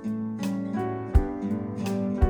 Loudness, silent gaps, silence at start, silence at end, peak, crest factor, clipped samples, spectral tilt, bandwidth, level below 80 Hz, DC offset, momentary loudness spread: -29 LUFS; none; 0 s; 0 s; -8 dBFS; 18 dB; under 0.1%; -8 dB/octave; 15 kHz; -30 dBFS; under 0.1%; 5 LU